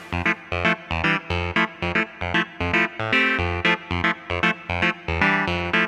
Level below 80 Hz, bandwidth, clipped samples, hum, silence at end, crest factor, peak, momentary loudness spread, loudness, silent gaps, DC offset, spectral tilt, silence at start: -40 dBFS; 11 kHz; under 0.1%; none; 0 s; 18 dB; -4 dBFS; 4 LU; -22 LUFS; none; under 0.1%; -5.5 dB/octave; 0 s